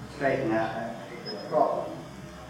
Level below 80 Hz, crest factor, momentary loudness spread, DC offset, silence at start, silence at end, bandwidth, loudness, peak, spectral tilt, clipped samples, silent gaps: -56 dBFS; 20 dB; 12 LU; under 0.1%; 0 s; 0 s; 16 kHz; -29 LUFS; -10 dBFS; -6 dB/octave; under 0.1%; none